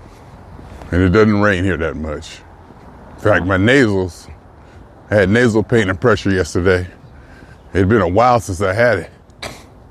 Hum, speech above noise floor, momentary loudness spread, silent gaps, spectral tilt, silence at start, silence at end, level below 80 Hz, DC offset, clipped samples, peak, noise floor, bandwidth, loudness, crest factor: none; 26 dB; 19 LU; none; -6.5 dB/octave; 0.35 s; 0.35 s; -40 dBFS; under 0.1%; under 0.1%; 0 dBFS; -40 dBFS; 13.5 kHz; -15 LUFS; 16 dB